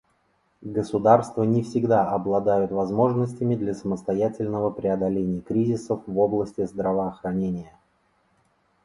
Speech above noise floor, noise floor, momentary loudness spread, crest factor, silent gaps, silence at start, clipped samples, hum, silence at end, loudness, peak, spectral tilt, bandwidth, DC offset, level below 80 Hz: 44 dB; -67 dBFS; 7 LU; 20 dB; none; 0.6 s; under 0.1%; none; 1.15 s; -24 LUFS; -4 dBFS; -8.5 dB/octave; 11.5 kHz; under 0.1%; -56 dBFS